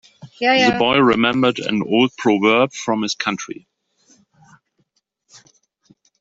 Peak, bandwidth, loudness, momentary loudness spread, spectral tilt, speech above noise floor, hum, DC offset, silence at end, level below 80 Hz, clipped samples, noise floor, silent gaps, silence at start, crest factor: -2 dBFS; 8 kHz; -17 LUFS; 9 LU; -4.5 dB/octave; 51 dB; none; under 0.1%; 2.65 s; -58 dBFS; under 0.1%; -67 dBFS; none; 0.25 s; 18 dB